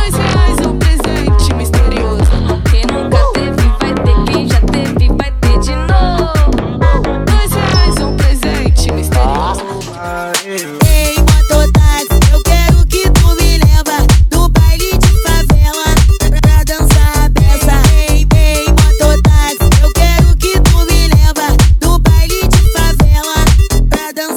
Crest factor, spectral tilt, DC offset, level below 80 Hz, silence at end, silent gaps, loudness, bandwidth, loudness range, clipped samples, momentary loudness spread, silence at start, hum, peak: 8 dB; -5 dB/octave; under 0.1%; -10 dBFS; 0 s; none; -11 LUFS; 18.5 kHz; 3 LU; 0.3%; 4 LU; 0 s; none; 0 dBFS